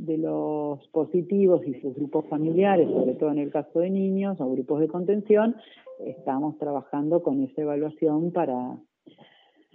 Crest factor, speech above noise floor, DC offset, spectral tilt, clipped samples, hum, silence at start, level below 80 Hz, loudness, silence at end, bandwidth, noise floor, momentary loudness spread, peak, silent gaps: 18 dB; 34 dB; under 0.1%; -8 dB/octave; under 0.1%; none; 0 s; -80 dBFS; -25 LUFS; 0.95 s; 3.8 kHz; -59 dBFS; 10 LU; -8 dBFS; none